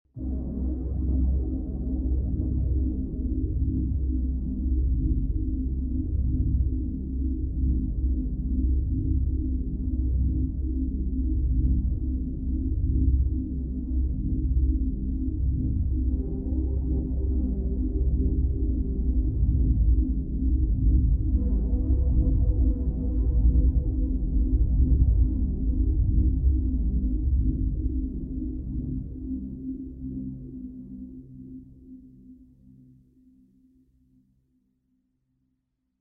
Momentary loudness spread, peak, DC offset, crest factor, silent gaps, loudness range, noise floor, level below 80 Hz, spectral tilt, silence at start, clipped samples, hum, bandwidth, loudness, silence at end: 9 LU; -8 dBFS; under 0.1%; 18 dB; none; 9 LU; -77 dBFS; -26 dBFS; -15.5 dB/octave; 0.15 s; under 0.1%; none; 1 kHz; -27 LUFS; 3.65 s